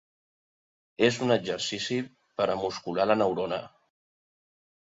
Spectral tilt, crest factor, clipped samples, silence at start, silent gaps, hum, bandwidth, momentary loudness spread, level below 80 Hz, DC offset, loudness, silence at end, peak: -4.5 dB/octave; 22 dB; under 0.1%; 1 s; none; none; 7.8 kHz; 9 LU; -66 dBFS; under 0.1%; -28 LUFS; 1.3 s; -8 dBFS